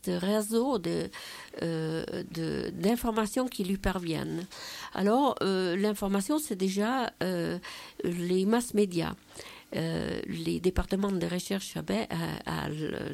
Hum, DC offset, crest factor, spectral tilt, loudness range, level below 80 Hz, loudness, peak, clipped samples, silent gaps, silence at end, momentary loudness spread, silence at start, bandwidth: none; under 0.1%; 16 dB; -5.5 dB/octave; 3 LU; -50 dBFS; -31 LUFS; -14 dBFS; under 0.1%; none; 0 s; 10 LU; 0.05 s; 16.5 kHz